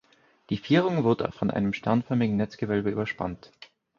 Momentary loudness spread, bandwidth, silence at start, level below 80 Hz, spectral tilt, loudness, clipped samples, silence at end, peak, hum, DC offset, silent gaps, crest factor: 10 LU; 7 kHz; 0.5 s; -56 dBFS; -8 dB/octave; -27 LUFS; under 0.1%; 0.35 s; -8 dBFS; none; under 0.1%; none; 18 dB